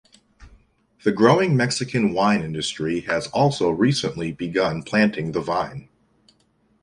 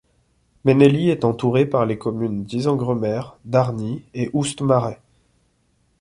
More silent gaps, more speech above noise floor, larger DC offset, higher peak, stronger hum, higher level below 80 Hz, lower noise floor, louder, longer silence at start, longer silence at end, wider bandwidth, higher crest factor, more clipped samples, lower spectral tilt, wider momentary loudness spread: neither; about the same, 42 dB vs 45 dB; neither; about the same, -2 dBFS vs -2 dBFS; neither; about the same, -54 dBFS vs -54 dBFS; about the same, -63 dBFS vs -64 dBFS; about the same, -21 LUFS vs -20 LUFS; second, 0.4 s vs 0.65 s; about the same, 1 s vs 1.05 s; about the same, 11.5 kHz vs 11.5 kHz; about the same, 20 dB vs 18 dB; neither; second, -5.5 dB/octave vs -7 dB/octave; about the same, 9 LU vs 11 LU